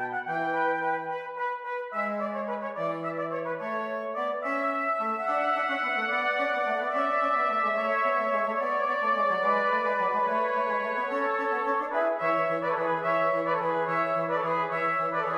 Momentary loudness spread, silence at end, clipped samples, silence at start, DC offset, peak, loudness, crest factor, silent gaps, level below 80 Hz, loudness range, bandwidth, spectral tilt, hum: 7 LU; 0 s; under 0.1%; 0 s; under 0.1%; -14 dBFS; -27 LUFS; 14 dB; none; -76 dBFS; 5 LU; 10.5 kHz; -6 dB/octave; none